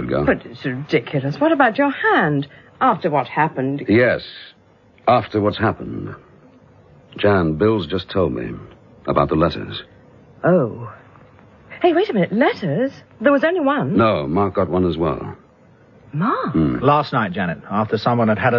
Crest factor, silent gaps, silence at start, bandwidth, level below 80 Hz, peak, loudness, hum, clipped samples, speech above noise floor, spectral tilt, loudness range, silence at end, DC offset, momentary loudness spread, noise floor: 18 dB; none; 0 s; 6.8 kHz; -46 dBFS; 0 dBFS; -19 LUFS; none; under 0.1%; 33 dB; -8.5 dB/octave; 4 LU; 0 s; under 0.1%; 13 LU; -51 dBFS